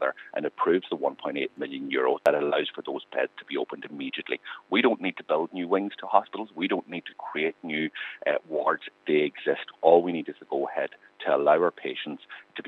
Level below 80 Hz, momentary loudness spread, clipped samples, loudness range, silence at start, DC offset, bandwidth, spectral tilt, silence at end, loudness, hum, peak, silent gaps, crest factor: -84 dBFS; 12 LU; under 0.1%; 3 LU; 0 s; under 0.1%; 9 kHz; -6.5 dB/octave; 0 s; -27 LUFS; none; -4 dBFS; none; 24 dB